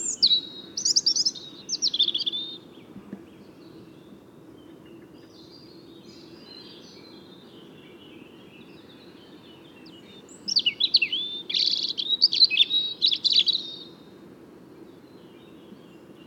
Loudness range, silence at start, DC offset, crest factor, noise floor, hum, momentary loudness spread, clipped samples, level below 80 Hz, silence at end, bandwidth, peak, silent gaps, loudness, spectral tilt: 10 LU; 0 s; under 0.1%; 22 dB; -49 dBFS; none; 25 LU; under 0.1%; -72 dBFS; 0.05 s; 17 kHz; -6 dBFS; none; -21 LUFS; 0.5 dB/octave